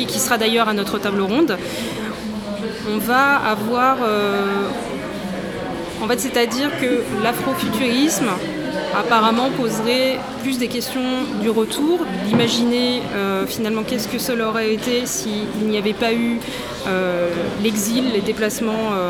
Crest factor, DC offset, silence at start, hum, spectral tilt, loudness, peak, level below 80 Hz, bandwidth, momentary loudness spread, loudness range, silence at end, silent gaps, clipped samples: 18 dB; under 0.1%; 0 s; none; -4 dB/octave; -20 LUFS; -2 dBFS; -48 dBFS; over 20 kHz; 9 LU; 2 LU; 0 s; none; under 0.1%